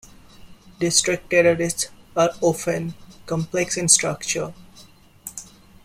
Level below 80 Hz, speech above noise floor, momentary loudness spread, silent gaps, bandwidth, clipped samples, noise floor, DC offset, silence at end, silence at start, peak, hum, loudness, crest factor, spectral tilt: -54 dBFS; 28 dB; 20 LU; none; 16 kHz; under 0.1%; -49 dBFS; under 0.1%; 0.4 s; 0.4 s; 0 dBFS; none; -20 LUFS; 22 dB; -3 dB/octave